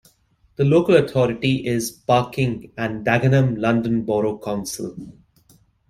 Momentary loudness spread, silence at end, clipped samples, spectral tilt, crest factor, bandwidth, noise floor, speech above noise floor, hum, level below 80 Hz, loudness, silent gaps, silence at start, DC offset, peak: 11 LU; 0.8 s; under 0.1%; -6.5 dB/octave; 18 dB; 13.5 kHz; -59 dBFS; 40 dB; none; -52 dBFS; -20 LUFS; none; 0.6 s; under 0.1%; -2 dBFS